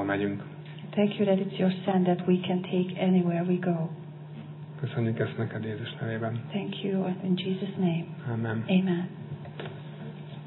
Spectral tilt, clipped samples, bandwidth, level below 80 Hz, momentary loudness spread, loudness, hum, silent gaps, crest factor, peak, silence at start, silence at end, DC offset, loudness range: -11 dB/octave; under 0.1%; 4.2 kHz; -76 dBFS; 15 LU; -29 LUFS; none; none; 18 dB; -12 dBFS; 0 s; 0 s; under 0.1%; 5 LU